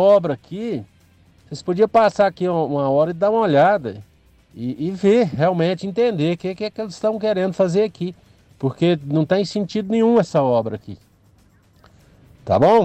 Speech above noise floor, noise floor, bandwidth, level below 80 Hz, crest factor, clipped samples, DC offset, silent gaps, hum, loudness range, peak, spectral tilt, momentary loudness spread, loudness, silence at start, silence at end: 36 dB; -54 dBFS; 9 kHz; -56 dBFS; 14 dB; under 0.1%; under 0.1%; none; none; 3 LU; -6 dBFS; -7 dB/octave; 14 LU; -19 LUFS; 0 s; 0 s